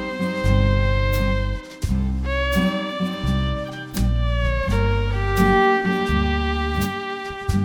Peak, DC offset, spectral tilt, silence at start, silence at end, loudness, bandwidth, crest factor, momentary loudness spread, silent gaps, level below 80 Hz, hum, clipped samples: -4 dBFS; under 0.1%; -6.5 dB/octave; 0 s; 0 s; -22 LUFS; 18 kHz; 16 dB; 8 LU; none; -26 dBFS; none; under 0.1%